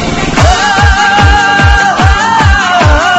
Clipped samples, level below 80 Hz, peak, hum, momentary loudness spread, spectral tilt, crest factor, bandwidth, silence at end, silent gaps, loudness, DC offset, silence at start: 1%; -14 dBFS; 0 dBFS; none; 2 LU; -4.5 dB/octave; 6 dB; 9 kHz; 0 s; none; -7 LUFS; under 0.1%; 0 s